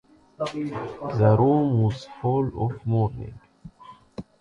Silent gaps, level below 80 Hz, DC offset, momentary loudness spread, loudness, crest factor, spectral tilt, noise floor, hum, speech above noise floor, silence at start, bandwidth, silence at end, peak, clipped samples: none; -50 dBFS; under 0.1%; 21 LU; -24 LUFS; 18 dB; -9 dB/octave; -49 dBFS; none; 26 dB; 0.4 s; 7.2 kHz; 0.2 s; -6 dBFS; under 0.1%